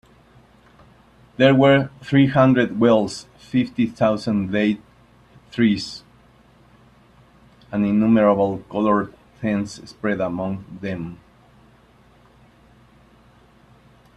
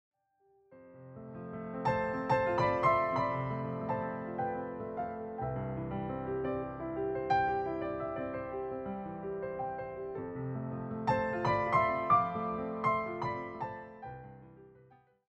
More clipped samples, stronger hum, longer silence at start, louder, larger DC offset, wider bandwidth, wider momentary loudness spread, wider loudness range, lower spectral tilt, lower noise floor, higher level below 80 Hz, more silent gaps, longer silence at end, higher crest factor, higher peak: neither; neither; first, 1.4 s vs 0.7 s; first, -20 LUFS vs -34 LUFS; neither; first, 10.5 kHz vs 8.4 kHz; about the same, 16 LU vs 14 LU; first, 12 LU vs 6 LU; about the same, -7 dB/octave vs -8 dB/octave; second, -53 dBFS vs -71 dBFS; about the same, -54 dBFS vs -58 dBFS; neither; first, 3.05 s vs 0.55 s; about the same, 20 dB vs 18 dB; first, -2 dBFS vs -16 dBFS